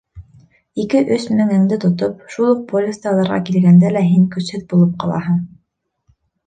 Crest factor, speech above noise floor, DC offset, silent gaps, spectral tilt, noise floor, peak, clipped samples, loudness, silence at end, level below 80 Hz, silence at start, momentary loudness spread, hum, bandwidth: 14 dB; 54 dB; under 0.1%; none; -8 dB/octave; -69 dBFS; -2 dBFS; under 0.1%; -16 LUFS; 1 s; -52 dBFS; 0.15 s; 10 LU; none; 9.2 kHz